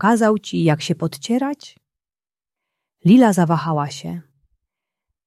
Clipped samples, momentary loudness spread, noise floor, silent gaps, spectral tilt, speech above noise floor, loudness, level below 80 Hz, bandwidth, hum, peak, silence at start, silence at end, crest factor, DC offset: under 0.1%; 18 LU; under -90 dBFS; none; -6.5 dB/octave; over 73 dB; -18 LUFS; -64 dBFS; 13 kHz; none; -2 dBFS; 0 s; 1.05 s; 18 dB; under 0.1%